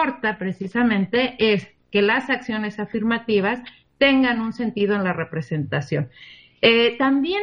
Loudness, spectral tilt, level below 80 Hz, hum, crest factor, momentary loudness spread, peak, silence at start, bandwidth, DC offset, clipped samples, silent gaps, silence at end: -21 LUFS; -7 dB/octave; -56 dBFS; none; 18 dB; 10 LU; -2 dBFS; 0 s; 7.2 kHz; under 0.1%; under 0.1%; none; 0 s